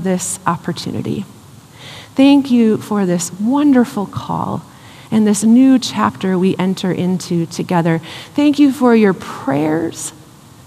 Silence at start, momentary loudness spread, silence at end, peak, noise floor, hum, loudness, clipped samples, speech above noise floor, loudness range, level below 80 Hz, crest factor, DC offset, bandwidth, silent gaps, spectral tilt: 0 s; 13 LU; 0.55 s; 0 dBFS; -39 dBFS; none; -15 LUFS; under 0.1%; 25 dB; 1 LU; -58 dBFS; 14 dB; under 0.1%; 14.5 kHz; none; -5.5 dB/octave